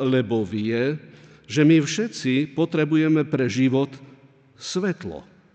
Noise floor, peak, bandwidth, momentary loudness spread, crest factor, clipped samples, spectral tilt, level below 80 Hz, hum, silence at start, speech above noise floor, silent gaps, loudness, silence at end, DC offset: -52 dBFS; -8 dBFS; 8.6 kHz; 14 LU; 14 dB; under 0.1%; -6 dB/octave; -64 dBFS; none; 0 s; 30 dB; none; -22 LUFS; 0.35 s; under 0.1%